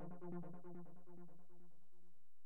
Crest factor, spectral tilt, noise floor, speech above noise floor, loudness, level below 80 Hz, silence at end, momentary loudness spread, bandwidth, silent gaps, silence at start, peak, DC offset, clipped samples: 18 dB; -10 dB/octave; -80 dBFS; 22 dB; -56 LUFS; under -90 dBFS; 0.35 s; 13 LU; 18 kHz; none; 0 s; -38 dBFS; 0.5%; under 0.1%